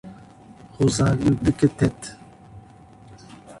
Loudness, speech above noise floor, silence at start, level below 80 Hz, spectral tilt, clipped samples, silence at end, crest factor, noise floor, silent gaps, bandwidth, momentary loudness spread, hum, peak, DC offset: -21 LUFS; 27 dB; 0.05 s; -44 dBFS; -6.5 dB/octave; under 0.1%; 0.05 s; 20 dB; -47 dBFS; none; 11.5 kHz; 20 LU; none; -4 dBFS; under 0.1%